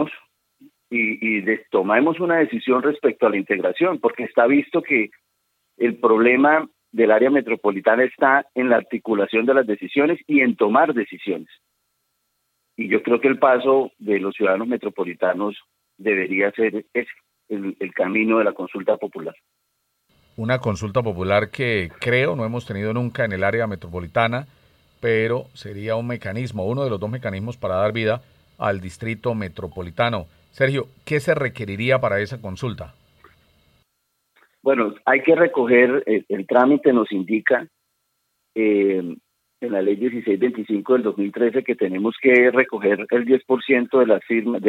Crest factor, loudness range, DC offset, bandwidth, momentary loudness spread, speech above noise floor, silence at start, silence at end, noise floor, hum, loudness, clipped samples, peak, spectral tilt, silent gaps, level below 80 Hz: 20 dB; 7 LU; under 0.1%; 11.5 kHz; 12 LU; 53 dB; 0 s; 0 s; -72 dBFS; none; -20 LUFS; under 0.1%; 0 dBFS; -7.5 dB/octave; none; -62 dBFS